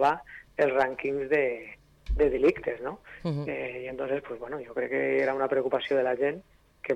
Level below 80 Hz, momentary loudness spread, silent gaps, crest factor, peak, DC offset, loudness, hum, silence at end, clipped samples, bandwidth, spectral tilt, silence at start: -44 dBFS; 13 LU; none; 14 dB; -14 dBFS; under 0.1%; -29 LUFS; none; 0 s; under 0.1%; 8.8 kHz; -7 dB/octave; 0 s